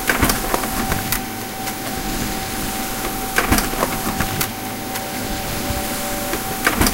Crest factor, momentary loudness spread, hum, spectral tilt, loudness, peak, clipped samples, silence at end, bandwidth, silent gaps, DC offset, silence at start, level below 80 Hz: 22 dB; 7 LU; none; -3 dB/octave; -21 LUFS; 0 dBFS; under 0.1%; 0 s; 17.5 kHz; none; under 0.1%; 0 s; -32 dBFS